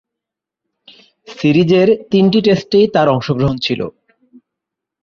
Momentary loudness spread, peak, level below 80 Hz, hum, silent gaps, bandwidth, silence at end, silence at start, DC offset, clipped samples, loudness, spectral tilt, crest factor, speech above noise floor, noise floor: 7 LU; -2 dBFS; -48 dBFS; none; none; 7 kHz; 1.1 s; 1.3 s; under 0.1%; under 0.1%; -13 LUFS; -7.5 dB/octave; 14 dB; 71 dB; -83 dBFS